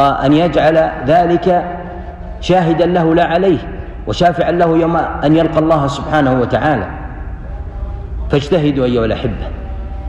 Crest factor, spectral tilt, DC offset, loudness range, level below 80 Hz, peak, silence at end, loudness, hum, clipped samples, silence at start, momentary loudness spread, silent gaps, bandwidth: 10 dB; -7.5 dB/octave; under 0.1%; 4 LU; -28 dBFS; -2 dBFS; 0 s; -13 LUFS; none; under 0.1%; 0 s; 15 LU; none; 8.6 kHz